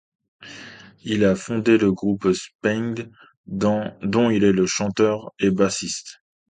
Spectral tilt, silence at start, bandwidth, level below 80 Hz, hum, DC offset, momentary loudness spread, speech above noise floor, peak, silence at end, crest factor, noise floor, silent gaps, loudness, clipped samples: -5.5 dB/octave; 0.4 s; 9.4 kHz; -54 dBFS; none; under 0.1%; 21 LU; 22 dB; -4 dBFS; 0.4 s; 18 dB; -42 dBFS; 2.55-2.59 s, 3.37-3.44 s; -21 LUFS; under 0.1%